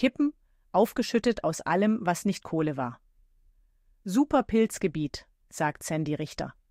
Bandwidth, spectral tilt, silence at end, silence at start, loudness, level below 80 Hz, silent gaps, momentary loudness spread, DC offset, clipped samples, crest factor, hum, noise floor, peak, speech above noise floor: 16 kHz; -5.5 dB/octave; 0.2 s; 0 s; -28 LUFS; -56 dBFS; none; 11 LU; under 0.1%; under 0.1%; 18 dB; none; -64 dBFS; -10 dBFS; 37 dB